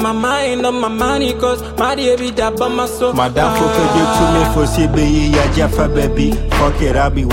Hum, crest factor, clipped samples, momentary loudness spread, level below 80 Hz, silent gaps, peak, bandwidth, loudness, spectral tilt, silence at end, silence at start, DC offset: none; 14 dB; under 0.1%; 4 LU; -22 dBFS; none; 0 dBFS; 16.5 kHz; -14 LUFS; -5.5 dB/octave; 0 s; 0 s; under 0.1%